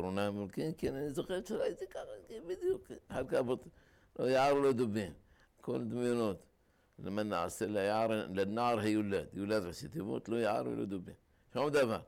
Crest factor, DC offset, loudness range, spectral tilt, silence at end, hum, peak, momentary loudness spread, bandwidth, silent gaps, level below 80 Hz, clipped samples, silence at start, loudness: 12 dB; under 0.1%; 4 LU; -6 dB/octave; 0 s; none; -24 dBFS; 13 LU; 16.5 kHz; none; -64 dBFS; under 0.1%; 0 s; -36 LUFS